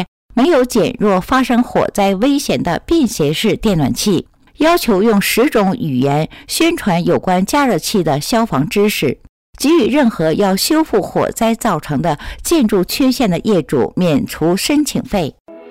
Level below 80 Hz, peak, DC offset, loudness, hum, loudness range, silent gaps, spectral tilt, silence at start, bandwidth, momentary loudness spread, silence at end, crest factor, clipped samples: -38 dBFS; -6 dBFS; 0.3%; -14 LUFS; none; 1 LU; 0.08-0.29 s, 9.29-9.53 s, 15.40-15.45 s; -5 dB/octave; 0 s; 16 kHz; 5 LU; 0 s; 8 dB; under 0.1%